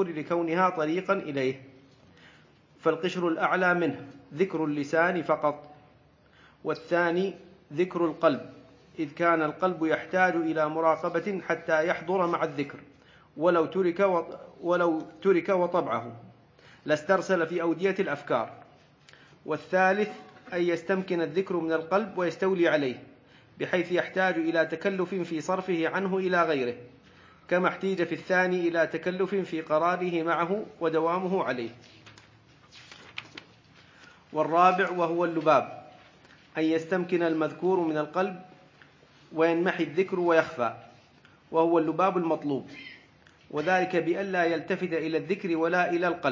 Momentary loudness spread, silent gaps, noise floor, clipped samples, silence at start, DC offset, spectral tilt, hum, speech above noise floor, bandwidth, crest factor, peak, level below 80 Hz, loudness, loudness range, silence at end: 12 LU; none; -59 dBFS; under 0.1%; 0 s; under 0.1%; -6.5 dB/octave; none; 32 dB; 7.6 kHz; 22 dB; -6 dBFS; -72 dBFS; -27 LUFS; 3 LU; 0 s